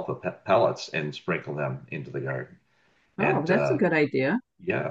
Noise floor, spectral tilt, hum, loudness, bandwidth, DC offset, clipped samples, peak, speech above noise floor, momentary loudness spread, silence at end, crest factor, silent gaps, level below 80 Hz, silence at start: -66 dBFS; -7 dB/octave; none; -27 LUFS; 8 kHz; under 0.1%; under 0.1%; -8 dBFS; 40 dB; 12 LU; 0 s; 18 dB; none; -68 dBFS; 0 s